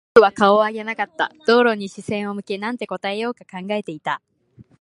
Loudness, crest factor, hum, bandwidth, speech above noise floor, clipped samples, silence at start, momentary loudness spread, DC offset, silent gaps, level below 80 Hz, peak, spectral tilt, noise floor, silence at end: -20 LUFS; 20 dB; none; 11 kHz; 31 dB; under 0.1%; 0.15 s; 12 LU; under 0.1%; none; -62 dBFS; 0 dBFS; -5.5 dB/octave; -51 dBFS; 0.2 s